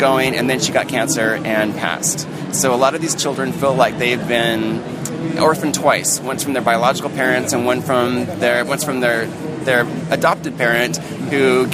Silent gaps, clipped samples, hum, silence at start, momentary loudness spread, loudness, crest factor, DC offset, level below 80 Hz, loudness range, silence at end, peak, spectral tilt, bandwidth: none; under 0.1%; none; 0 s; 6 LU; -17 LUFS; 16 dB; under 0.1%; -54 dBFS; 1 LU; 0 s; 0 dBFS; -3.5 dB/octave; 15.5 kHz